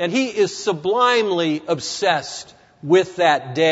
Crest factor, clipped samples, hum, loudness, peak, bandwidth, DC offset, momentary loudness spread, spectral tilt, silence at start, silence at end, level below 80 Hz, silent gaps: 16 dB; under 0.1%; none; -19 LUFS; -2 dBFS; 8 kHz; under 0.1%; 7 LU; -4 dB/octave; 0 s; 0 s; -66 dBFS; none